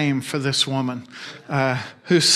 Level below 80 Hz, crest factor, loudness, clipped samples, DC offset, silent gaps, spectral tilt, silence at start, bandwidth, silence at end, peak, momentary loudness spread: -66 dBFS; 18 dB; -22 LUFS; under 0.1%; under 0.1%; none; -3.5 dB/octave; 0 s; 15 kHz; 0 s; -4 dBFS; 13 LU